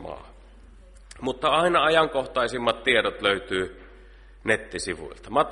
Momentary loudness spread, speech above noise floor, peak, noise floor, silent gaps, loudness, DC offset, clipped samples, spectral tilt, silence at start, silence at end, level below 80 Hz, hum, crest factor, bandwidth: 14 LU; 24 dB; -6 dBFS; -48 dBFS; none; -24 LUFS; under 0.1%; under 0.1%; -3.5 dB/octave; 0 s; 0 s; -48 dBFS; none; 20 dB; 11.5 kHz